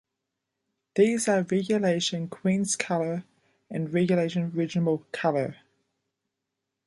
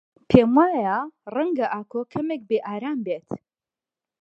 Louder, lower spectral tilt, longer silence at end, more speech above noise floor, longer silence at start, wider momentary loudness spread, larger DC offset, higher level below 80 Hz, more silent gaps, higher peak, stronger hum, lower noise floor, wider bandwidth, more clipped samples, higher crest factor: second, -26 LUFS vs -23 LUFS; second, -5 dB/octave vs -9 dB/octave; first, 1.3 s vs 0.85 s; second, 58 dB vs over 68 dB; first, 0.95 s vs 0.3 s; second, 9 LU vs 13 LU; neither; second, -70 dBFS vs -52 dBFS; neither; second, -8 dBFS vs 0 dBFS; neither; second, -84 dBFS vs under -90 dBFS; first, 11.5 kHz vs 7 kHz; neither; about the same, 20 dB vs 24 dB